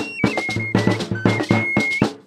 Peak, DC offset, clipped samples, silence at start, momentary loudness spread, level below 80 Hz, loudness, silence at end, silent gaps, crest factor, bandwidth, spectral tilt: -2 dBFS; under 0.1%; under 0.1%; 0 s; 3 LU; -48 dBFS; -19 LUFS; 0.1 s; none; 18 dB; 13.5 kHz; -6 dB/octave